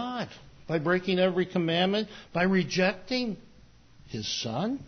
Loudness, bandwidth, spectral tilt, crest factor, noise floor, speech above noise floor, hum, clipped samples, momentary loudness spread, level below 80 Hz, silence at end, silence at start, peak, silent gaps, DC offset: -28 LUFS; 6.6 kHz; -5 dB/octave; 16 dB; -55 dBFS; 27 dB; none; under 0.1%; 11 LU; -60 dBFS; 0 s; 0 s; -12 dBFS; none; under 0.1%